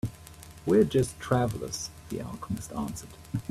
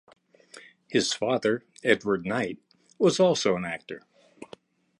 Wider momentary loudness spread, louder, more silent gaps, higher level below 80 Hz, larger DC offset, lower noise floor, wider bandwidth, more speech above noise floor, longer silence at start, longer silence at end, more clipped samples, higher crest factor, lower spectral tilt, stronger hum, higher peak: second, 14 LU vs 22 LU; second, -30 LUFS vs -26 LUFS; neither; first, -52 dBFS vs -66 dBFS; neither; second, -48 dBFS vs -52 dBFS; first, 15.5 kHz vs 11.5 kHz; second, 19 dB vs 27 dB; second, 0.05 s vs 0.55 s; second, 0 s vs 0.55 s; neither; about the same, 18 dB vs 22 dB; first, -6 dB/octave vs -4 dB/octave; neither; second, -12 dBFS vs -6 dBFS